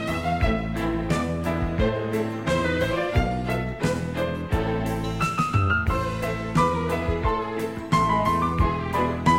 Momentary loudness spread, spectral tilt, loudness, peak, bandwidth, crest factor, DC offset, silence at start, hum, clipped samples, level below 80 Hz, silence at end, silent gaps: 5 LU; -6.5 dB/octave; -25 LUFS; -6 dBFS; 16.5 kHz; 18 dB; 0.2%; 0 s; none; under 0.1%; -34 dBFS; 0 s; none